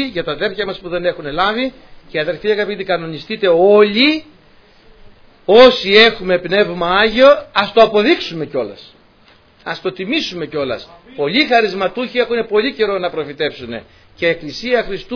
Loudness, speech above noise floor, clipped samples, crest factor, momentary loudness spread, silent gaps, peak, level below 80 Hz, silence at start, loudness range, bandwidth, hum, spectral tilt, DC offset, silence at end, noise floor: -14 LUFS; 34 dB; under 0.1%; 16 dB; 14 LU; none; 0 dBFS; -44 dBFS; 0 s; 8 LU; 5.4 kHz; none; -5 dB/octave; under 0.1%; 0 s; -49 dBFS